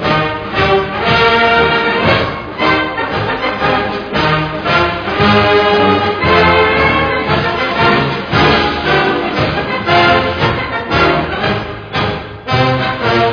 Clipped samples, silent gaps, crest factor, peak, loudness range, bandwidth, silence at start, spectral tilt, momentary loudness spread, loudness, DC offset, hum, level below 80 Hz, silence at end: under 0.1%; none; 12 dB; 0 dBFS; 3 LU; 5.4 kHz; 0 s; -6.5 dB/octave; 7 LU; -12 LUFS; under 0.1%; none; -32 dBFS; 0 s